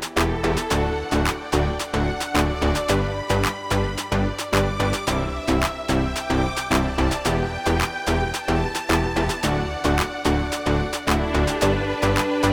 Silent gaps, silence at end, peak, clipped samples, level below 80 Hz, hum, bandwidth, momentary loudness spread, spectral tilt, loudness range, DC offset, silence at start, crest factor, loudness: none; 0 s; -4 dBFS; under 0.1%; -30 dBFS; none; over 20 kHz; 3 LU; -5 dB/octave; 1 LU; under 0.1%; 0 s; 18 dB; -22 LUFS